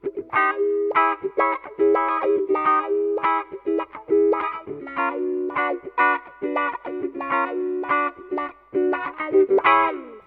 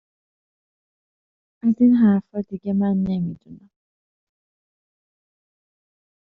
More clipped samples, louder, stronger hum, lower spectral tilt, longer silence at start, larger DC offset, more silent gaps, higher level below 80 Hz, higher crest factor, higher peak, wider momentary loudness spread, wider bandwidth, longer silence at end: neither; about the same, -22 LUFS vs -20 LUFS; neither; second, -7.5 dB/octave vs -10 dB/octave; second, 0.05 s vs 1.65 s; neither; neither; about the same, -64 dBFS vs -60 dBFS; about the same, 20 dB vs 16 dB; first, -2 dBFS vs -8 dBFS; second, 8 LU vs 15 LU; about the same, 4.2 kHz vs 4.3 kHz; second, 0.05 s vs 2.65 s